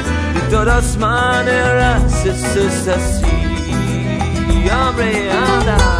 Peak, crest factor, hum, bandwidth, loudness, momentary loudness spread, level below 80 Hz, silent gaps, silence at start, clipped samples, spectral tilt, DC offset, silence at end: -2 dBFS; 12 dB; none; 11 kHz; -15 LUFS; 5 LU; -20 dBFS; none; 0 s; under 0.1%; -5 dB/octave; under 0.1%; 0 s